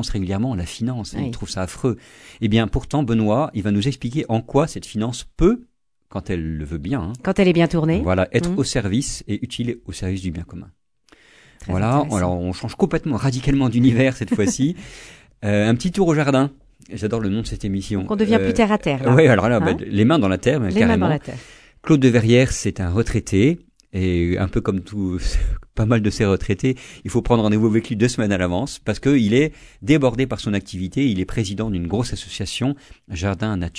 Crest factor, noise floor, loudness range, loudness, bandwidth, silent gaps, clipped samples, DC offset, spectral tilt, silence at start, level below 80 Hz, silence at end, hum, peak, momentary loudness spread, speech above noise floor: 20 dB; -55 dBFS; 6 LU; -20 LUFS; 11 kHz; none; under 0.1%; under 0.1%; -6.5 dB/octave; 0 s; -34 dBFS; 0 s; none; 0 dBFS; 11 LU; 35 dB